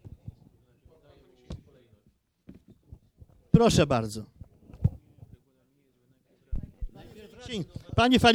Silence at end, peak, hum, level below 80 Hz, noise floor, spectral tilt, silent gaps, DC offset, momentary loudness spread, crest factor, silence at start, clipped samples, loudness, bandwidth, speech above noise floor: 0 s; -4 dBFS; none; -44 dBFS; -68 dBFS; -5.5 dB/octave; none; under 0.1%; 27 LU; 26 dB; 0.05 s; under 0.1%; -26 LUFS; 16 kHz; 45 dB